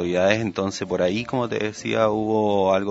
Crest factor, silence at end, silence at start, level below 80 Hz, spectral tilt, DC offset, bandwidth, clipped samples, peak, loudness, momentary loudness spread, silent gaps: 20 dB; 0 s; 0 s; -56 dBFS; -5.5 dB/octave; under 0.1%; 8 kHz; under 0.1%; -2 dBFS; -22 LUFS; 6 LU; none